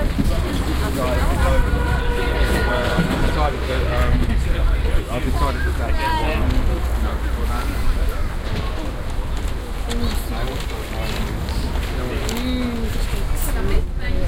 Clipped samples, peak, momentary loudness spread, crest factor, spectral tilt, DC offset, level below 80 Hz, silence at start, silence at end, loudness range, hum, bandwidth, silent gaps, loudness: under 0.1%; -4 dBFS; 7 LU; 16 dB; -5.5 dB/octave; under 0.1%; -20 dBFS; 0 s; 0 s; 6 LU; none; 16.5 kHz; none; -22 LUFS